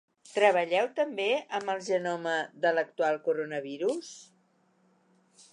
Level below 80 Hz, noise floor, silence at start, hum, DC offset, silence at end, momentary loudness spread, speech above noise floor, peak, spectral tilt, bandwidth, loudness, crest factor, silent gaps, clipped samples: -88 dBFS; -68 dBFS; 0.25 s; none; under 0.1%; 1.3 s; 11 LU; 39 dB; -10 dBFS; -3.5 dB/octave; 11 kHz; -29 LUFS; 20 dB; none; under 0.1%